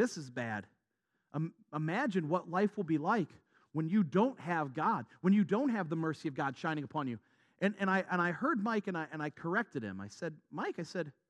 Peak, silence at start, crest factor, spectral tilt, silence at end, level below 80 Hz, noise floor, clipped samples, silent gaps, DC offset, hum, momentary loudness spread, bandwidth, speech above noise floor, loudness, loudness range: -16 dBFS; 0 s; 18 dB; -7 dB/octave; 0.2 s; -86 dBFS; -84 dBFS; under 0.1%; none; under 0.1%; none; 11 LU; 10.5 kHz; 49 dB; -35 LUFS; 3 LU